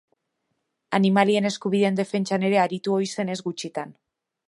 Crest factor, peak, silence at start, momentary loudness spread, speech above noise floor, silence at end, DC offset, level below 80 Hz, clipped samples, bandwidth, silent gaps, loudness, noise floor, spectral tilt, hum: 20 dB; -4 dBFS; 0.9 s; 12 LU; 54 dB; 0.6 s; under 0.1%; -74 dBFS; under 0.1%; 11.5 kHz; none; -23 LUFS; -77 dBFS; -5.5 dB/octave; none